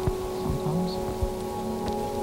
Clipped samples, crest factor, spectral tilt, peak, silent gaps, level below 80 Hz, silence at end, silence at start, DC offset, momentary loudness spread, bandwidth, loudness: under 0.1%; 16 dB; -6.5 dB/octave; -14 dBFS; none; -38 dBFS; 0 s; 0 s; under 0.1%; 3 LU; 17.5 kHz; -30 LUFS